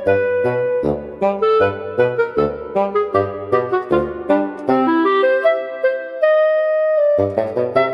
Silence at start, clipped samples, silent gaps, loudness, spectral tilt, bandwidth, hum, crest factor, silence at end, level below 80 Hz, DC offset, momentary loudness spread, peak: 0 s; under 0.1%; none; -17 LUFS; -8 dB/octave; 5.8 kHz; none; 16 dB; 0 s; -48 dBFS; under 0.1%; 5 LU; -2 dBFS